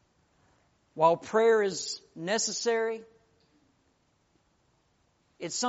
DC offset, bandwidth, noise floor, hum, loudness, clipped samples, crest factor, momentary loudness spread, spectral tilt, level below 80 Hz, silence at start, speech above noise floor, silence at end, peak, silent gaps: under 0.1%; 8 kHz; -71 dBFS; none; -28 LUFS; under 0.1%; 22 dB; 15 LU; -2 dB/octave; -76 dBFS; 0.95 s; 43 dB; 0 s; -10 dBFS; none